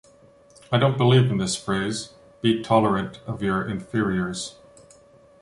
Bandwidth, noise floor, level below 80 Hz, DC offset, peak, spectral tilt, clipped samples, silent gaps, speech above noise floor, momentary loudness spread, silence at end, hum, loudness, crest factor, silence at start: 11.5 kHz; -53 dBFS; -52 dBFS; under 0.1%; -6 dBFS; -5.5 dB/octave; under 0.1%; none; 31 dB; 14 LU; 0.9 s; none; -23 LUFS; 18 dB; 0.7 s